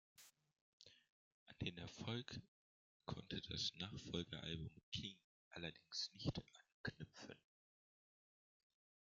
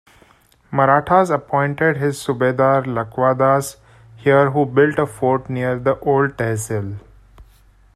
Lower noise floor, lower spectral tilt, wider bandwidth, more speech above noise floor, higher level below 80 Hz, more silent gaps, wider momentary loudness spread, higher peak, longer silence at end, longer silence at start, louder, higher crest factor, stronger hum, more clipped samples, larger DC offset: first, under -90 dBFS vs -53 dBFS; second, -4.5 dB/octave vs -6.5 dB/octave; second, 8.8 kHz vs 13.5 kHz; first, over 40 dB vs 36 dB; second, -72 dBFS vs -50 dBFS; first, 0.61-0.80 s, 1.09-1.46 s, 2.48-3.00 s, 4.83-4.92 s, 5.24-5.51 s, 6.74-6.84 s vs none; first, 22 LU vs 9 LU; second, -28 dBFS vs -2 dBFS; first, 1.7 s vs 0.55 s; second, 0.2 s vs 0.7 s; second, -50 LUFS vs -18 LUFS; first, 24 dB vs 18 dB; neither; neither; neither